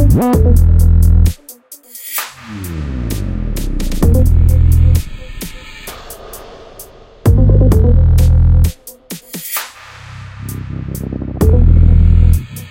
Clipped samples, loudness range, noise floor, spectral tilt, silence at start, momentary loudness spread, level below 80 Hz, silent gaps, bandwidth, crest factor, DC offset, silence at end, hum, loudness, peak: under 0.1%; 5 LU; -37 dBFS; -7 dB/octave; 0 s; 21 LU; -14 dBFS; none; 17 kHz; 12 dB; under 0.1%; 0 s; none; -13 LUFS; 0 dBFS